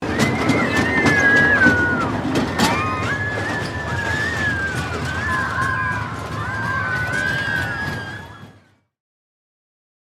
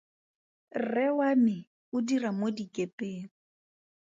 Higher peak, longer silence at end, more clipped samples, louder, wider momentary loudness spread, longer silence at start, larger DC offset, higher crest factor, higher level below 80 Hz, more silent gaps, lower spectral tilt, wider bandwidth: first, -2 dBFS vs -16 dBFS; first, 1.65 s vs 0.85 s; neither; first, -19 LUFS vs -30 LUFS; about the same, 12 LU vs 14 LU; second, 0 s vs 0.75 s; neither; about the same, 20 dB vs 16 dB; first, -44 dBFS vs -78 dBFS; second, none vs 1.67-1.92 s, 2.93-2.98 s; second, -5 dB/octave vs -6.5 dB/octave; first, 16 kHz vs 7.8 kHz